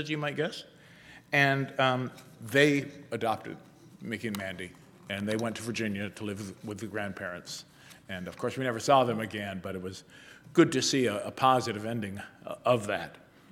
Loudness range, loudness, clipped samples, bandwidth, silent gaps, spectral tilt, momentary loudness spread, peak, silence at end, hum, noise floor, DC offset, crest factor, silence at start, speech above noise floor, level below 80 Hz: 7 LU; -30 LUFS; under 0.1%; 17.5 kHz; none; -4.5 dB/octave; 18 LU; -8 dBFS; 0.35 s; none; -53 dBFS; under 0.1%; 22 dB; 0 s; 23 dB; -72 dBFS